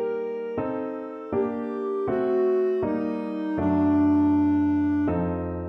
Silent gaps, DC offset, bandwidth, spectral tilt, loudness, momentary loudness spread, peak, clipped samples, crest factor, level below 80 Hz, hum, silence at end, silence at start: none; under 0.1%; 4.2 kHz; -10.5 dB/octave; -25 LUFS; 9 LU; -14 dBFS; under 0.1%; 10 dB; -52 dBFS; none; 0 s; 0 s